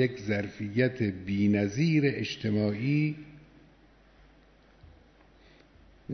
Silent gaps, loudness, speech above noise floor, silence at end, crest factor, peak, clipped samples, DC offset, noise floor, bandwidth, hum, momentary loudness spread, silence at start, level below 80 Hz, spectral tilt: none; -28 LUFS; 31 dB; 0 s; 18 dB; -12 dBFS; under 0.1%; under 0.1%; -59 dBFS; 6.4 kHz; none; 7 LU; 0 s; -60 dBFS; -7 dB/octave